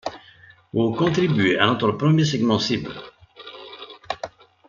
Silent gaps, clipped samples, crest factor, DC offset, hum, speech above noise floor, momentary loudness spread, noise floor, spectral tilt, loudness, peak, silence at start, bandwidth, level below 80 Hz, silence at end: none; under 0.1%; 20 dB; under 0.1%; none; 31 dB; 20 LU; -50 dBFS; -6 dB/octave; -21 LUFS; -2 dBFS; 0.05 s; 7.4 kHz; -58 dBFS; 0.4 s